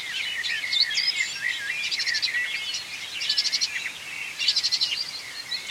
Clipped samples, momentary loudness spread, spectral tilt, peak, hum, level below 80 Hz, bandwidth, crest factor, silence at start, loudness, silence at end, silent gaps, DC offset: under 0.1%; 10 LU; 2.5 dB/octave; -8 dBFS; none; -70 dBFS; 16.5 kHz; 20 dB; 0 s; -24 LUFS; 0 s; none; under 0.1%